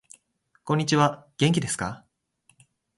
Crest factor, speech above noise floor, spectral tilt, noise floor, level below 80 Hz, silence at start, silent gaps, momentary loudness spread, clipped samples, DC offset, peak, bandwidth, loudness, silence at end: 20 dB; 45 dB; -5 dB/octave; -68 dBFS; -58 dBFS; 0.65 s; none; 16 LU; under 0.1%; under 0.1%; -6 dBFS; 11.5 kHz; -25 LUFS; 1 s